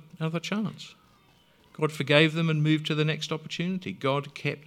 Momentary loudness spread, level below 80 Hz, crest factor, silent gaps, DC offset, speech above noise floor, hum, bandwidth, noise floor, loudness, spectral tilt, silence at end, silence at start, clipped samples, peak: 11 LU; -72 dBFS; 24 dB; none; under 0.1%; 34 dB; none; 13 kHz; -61 dBFS; -27 LUFS; -6 dB/octave; 0.05 s; 0.15 s; under 0.1%; -4 dBFS